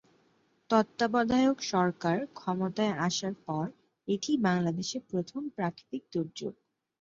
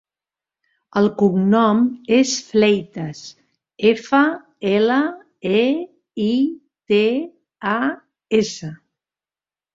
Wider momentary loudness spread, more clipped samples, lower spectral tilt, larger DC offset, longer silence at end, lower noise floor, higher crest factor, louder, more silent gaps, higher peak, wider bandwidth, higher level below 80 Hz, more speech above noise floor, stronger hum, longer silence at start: second, 11 LU vs 15 LU; neither; about the same, -5.5 dB/octave vs -5.5 dB/octave; neither; second, 0.5 s vs 1 s; second, -69 dBFS vs under -90 dBFS; about the same, 22 dB vs 18 dB; second, -31 LUFS vs -19 LUFS; neither; second, -10 dBFS vs -2 dBFS; about the same, 7.6 kHz vs 7.8 kHz; second, -68 dBFS vs -62 dBFS; second, 39 dB vs over 72 dB; neither; second, 0.7 s vs 0.95 s